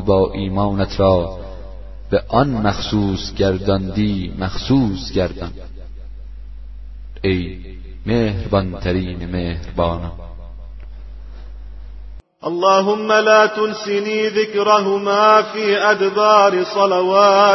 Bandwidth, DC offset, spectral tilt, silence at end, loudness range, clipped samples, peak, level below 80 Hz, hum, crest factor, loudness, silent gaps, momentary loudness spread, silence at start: 6.2 kHz; under 0.1%; -6 dB/octave; 0 s; 10 LU; under 0.1%; 0 dBFS; -34 dBFS; none; 18 dB; -17 LUFS; none; 25 LU; 0 s